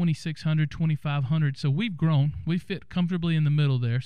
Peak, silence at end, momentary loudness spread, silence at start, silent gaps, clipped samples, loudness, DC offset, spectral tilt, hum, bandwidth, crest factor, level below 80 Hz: -14 dBFS; 0 s; 6 LU; 0 s; none; under 0.1%; -26 LUFS; 0.5%; -8 dB/octave; none; 9.6 kHz; 10 dB; -52 dBFS